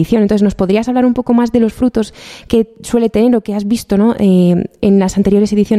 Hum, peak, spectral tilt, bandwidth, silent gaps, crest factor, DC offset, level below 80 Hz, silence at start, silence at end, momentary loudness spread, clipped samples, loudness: none; 0 dBFS; -7.5 dB/octave; 14 kHz; none; 12 dB; under 0.1%; -38 dBFS; 0 s; 0 s; 6 LU; under 0.1%; -13 LUFS